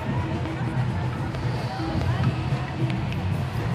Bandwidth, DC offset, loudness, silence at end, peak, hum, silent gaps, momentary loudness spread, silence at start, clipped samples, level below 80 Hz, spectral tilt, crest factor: 11.5 kHz; under 0.1%; -27 LUFS; 0 s; -12 dBFS; none; none; 3 LU; 0 s; under 0.1%; -40 dBFS; -7.5 dB/octave; 14 dB